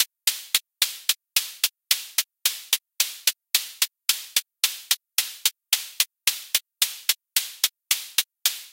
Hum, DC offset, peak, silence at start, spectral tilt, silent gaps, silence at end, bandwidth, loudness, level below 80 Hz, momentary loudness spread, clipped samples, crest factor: none; under 0.1%; -2 dBFS; 0 s; 5.5 dB/octave; none; 0.05 s; 17.5 kHz; -23 LUFS; -86 dBFS; 3 LU; under 0.1%; 26 dB